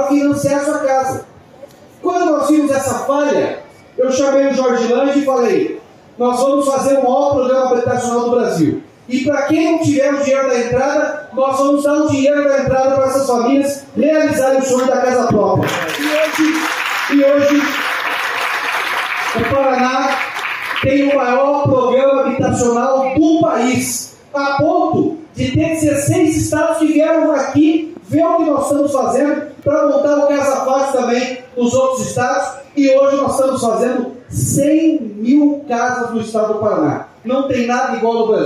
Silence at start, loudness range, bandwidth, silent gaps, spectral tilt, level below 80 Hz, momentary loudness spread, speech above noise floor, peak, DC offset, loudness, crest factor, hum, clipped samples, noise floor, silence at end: 0 s; 2 LU; 16 kHz; none; -5 dB/octave; -48 dBFS; 6 LU; 25 dB; -2 dBFS; under 0.1%; -15 LUFS; 12 dB; none; under 0.1%; -39 dBFS; 0 s